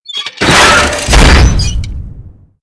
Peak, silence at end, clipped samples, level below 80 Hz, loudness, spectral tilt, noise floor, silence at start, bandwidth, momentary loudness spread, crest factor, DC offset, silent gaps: 0 dBFS; 0.35 s; 2%; -12 dBFS; -7 LUFS; -3.5 dB/octave; -32 dBFS; 0.1 s; 11 kHz; 16 LU; 8 dB; under 0.1%; none